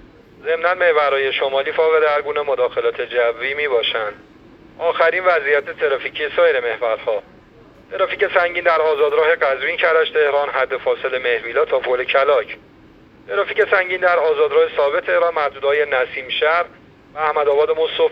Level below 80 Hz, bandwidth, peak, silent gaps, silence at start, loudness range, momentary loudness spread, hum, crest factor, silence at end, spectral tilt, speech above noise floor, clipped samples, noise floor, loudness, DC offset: -56 dBFS; 5.4 kHz; 0 dBFS; none; 0.4 s; 2 LU; 7 LU; none; 18 dB; 0 s; -5 dB/octave; 29 dB; under 0.1%; -46 dBFS; -17 LUFS; under 0.1%